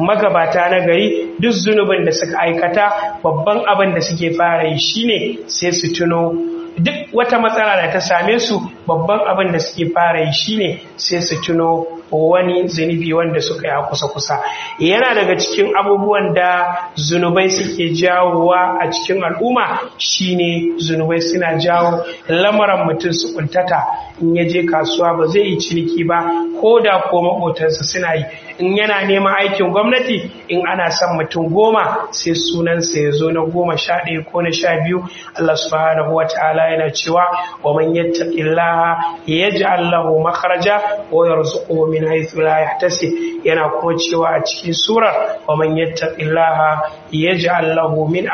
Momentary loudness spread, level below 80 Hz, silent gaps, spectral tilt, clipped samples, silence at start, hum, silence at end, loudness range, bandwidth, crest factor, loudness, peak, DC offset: 5 LU; -54 dBFS; none; -3.5 dB/octave; under 0.1%; 0 s; none; 0 s; 2 LU; 6.8 kHz; 14 dB; -15 LUFS; 0 dBFS; under 0.1%